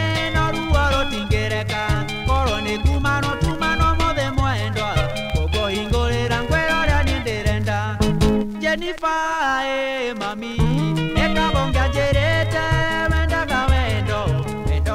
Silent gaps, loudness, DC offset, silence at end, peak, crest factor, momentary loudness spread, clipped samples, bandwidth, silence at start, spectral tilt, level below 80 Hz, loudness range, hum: none; -20 LUFS; under 0.1%; 0 s; -4 dBFS; 14 dB; 4 LU; under 0.1%; 15.5 kHz; 0 s; -5.5 dB/octave; -26 dBFS; 2 LU; none